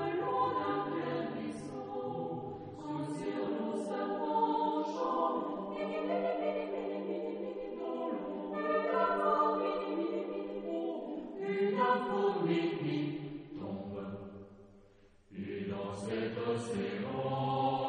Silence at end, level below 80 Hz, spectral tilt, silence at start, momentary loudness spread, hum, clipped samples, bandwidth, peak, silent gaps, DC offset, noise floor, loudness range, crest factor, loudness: 0 s; -70 dBFS; -7 dB/octave; 0 s; 11 LU; none; under 0.1%; 10 kHz; -18 dBFS; none; under 0.1%; -62 dBFS; 6 LU; 18 dB; -35 LUFS